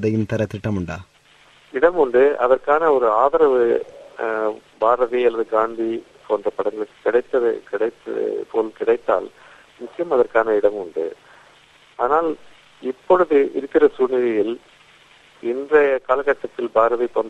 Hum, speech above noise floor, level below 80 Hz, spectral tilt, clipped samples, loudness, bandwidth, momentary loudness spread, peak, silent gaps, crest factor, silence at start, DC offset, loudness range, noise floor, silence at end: none; 33 dB; -56 dBFS; -7.5 dB/octave; under 0.1%; -19 LUFS; 8.4 kHz; 13 LU; -2 dBFS; none; 18 dB; 0 s; under 0.1%; 5 LU; -52 dBFS; 0 s